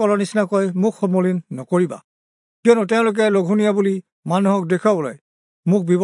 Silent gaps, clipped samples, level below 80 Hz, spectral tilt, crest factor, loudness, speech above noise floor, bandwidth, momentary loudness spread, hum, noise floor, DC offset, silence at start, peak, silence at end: 2.04-2.63 s, 4.12-4.23 s, 5.21-5.63 s; under 0.1%; -74 dBFS; -7 dB/octave; 16 dB; -19 LUFS; over 73 dB; 11 kHz; 8 LU; none; under -90 dBFS; under 0.1%; 0 s; -2 dBFS; 0 s